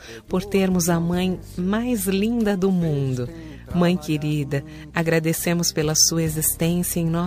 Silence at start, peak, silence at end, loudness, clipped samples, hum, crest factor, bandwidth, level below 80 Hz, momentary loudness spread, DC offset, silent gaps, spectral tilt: 0 s; -4 dBFS; 0 s; -21 LUFS; under 0.1%; none; 18 dB; 15.5 kHz; -42 dBFS; 9 LU; under 0.1%; none; -4.5 dB/octave